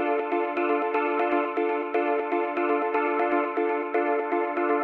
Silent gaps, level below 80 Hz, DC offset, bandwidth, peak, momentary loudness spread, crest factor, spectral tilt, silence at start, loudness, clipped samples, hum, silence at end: none; -76 dBFS; under 0.1%; 4.7 kHz; -12 dBFS; 2 LU; 14 dB; -6 dB/octave; 0 s; -25 LUFS; under 0.1%; none; 0 s